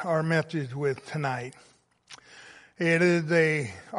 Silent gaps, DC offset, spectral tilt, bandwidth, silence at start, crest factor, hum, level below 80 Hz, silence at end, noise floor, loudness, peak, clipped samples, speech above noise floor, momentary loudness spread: none; under 0.1%; -6.5 dB/octave; 11.5 kHz; 0 s; 18 dB; none; -70 dBFS; 0 s; -53 dBFS; -26 LUFS; -10 dBFS; under 0.1%; 26 dB; 15 LU